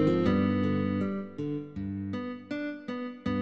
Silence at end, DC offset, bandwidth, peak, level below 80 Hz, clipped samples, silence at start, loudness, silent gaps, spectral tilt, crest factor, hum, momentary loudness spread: 0 s; under 0.1%; 7.4 kHz; -14 dBFS; -56 dBFS; under 0.1%; 0 s; -31 LUFS; none; -9 dB/octave; 16 dB; none; 11 LU